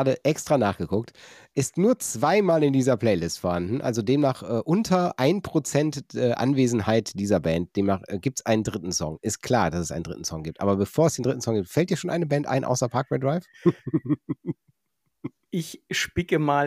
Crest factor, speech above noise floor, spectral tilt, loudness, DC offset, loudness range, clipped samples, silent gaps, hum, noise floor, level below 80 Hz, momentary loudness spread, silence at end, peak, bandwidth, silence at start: 16 dB; 54 dB; -5.5 dB/octave; -25 LUFS; under 0.1%; 4 LU; under 0.1%; none; none; -78 dBFS; -54 dBFS; 10 LU; 0 s; -8 dBFS; 16 kHz; 0 s